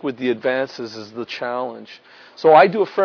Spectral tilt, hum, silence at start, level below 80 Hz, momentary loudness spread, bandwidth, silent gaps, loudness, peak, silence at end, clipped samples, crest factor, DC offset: -6 dB/octave; none; 0 s; -72 dBFS; 19 LU; 5.4 kHz; none; -18 LUFS; 0 dBFS; 0 s; under 0.1%; 18 dB; under 0.1%